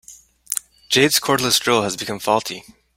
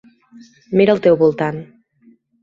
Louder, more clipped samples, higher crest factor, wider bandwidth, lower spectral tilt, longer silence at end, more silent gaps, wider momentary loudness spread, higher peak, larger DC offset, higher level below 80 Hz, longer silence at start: second, -18 LUFS vs -15 LUFS; neither; about the same, 20 dB vs 16 dB; first, 16.5 kHz vs 7.4 kHz; second, -2.5 dB/octave vs -8.5 dB/octave; second, 0.35 s vs 0.8 s; neither; about the same, 11 LU vs 10 LU; about the same, 0 dBFS vs -2 dBFS; neither; about the same, -56 dBFS vs -58 dBFS; second, 0.1 s vs 0.7 s